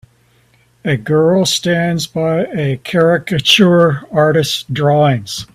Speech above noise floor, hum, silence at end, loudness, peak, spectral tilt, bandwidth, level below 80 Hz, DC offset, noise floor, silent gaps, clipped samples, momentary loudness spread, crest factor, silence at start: 40 dB; none; 0.1 s; -13 LUFS; 0 dBFS; -5 dB/octave; 15.5 kHz; -50 dBFS; under 0.1%; -53 dBFS; none; under 0.1%; 9 LU; 14 dB; 0.85 s